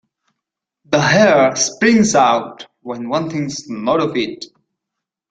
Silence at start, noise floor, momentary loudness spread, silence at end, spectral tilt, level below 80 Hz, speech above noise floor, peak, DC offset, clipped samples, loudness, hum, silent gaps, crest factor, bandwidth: 0.9 s; -81 dBFS; 18 LU; 0.85 s; -4 dB/octave; -56 dBFS; 66 dB; -2 dBFS; under 0.1%; under 0.1%; -15 LUFS; none; none; 16 dB; 9.4 kHz